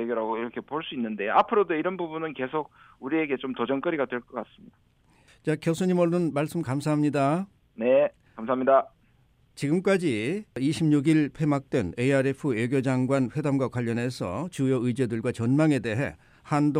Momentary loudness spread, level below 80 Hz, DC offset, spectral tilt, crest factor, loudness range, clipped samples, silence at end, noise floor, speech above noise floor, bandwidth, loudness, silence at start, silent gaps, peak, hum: 10 LU; -62 dBFS; under 0.1%; -7 dB/octave; 20 dB; 4 LU; under 0.1%; 0 s; -62 dBFS; 37 dB; 15 kHz; -26 LUFS; 0 s; none; -6 dBFS; none